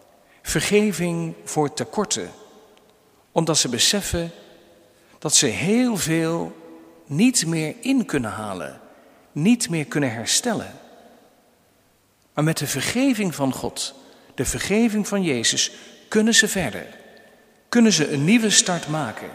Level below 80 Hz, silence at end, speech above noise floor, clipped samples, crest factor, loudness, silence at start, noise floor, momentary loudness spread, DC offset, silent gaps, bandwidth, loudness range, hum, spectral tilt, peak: -48 dBFS; 0 s; 39 dB; under 0.1%; 22 dB; -21 LUFS; 0.45 s; -60 dBFS; 13 LU; under 0.1%; none; 16 kHz; 5 LU; none; -3.5 dB/octave; 0 dBFS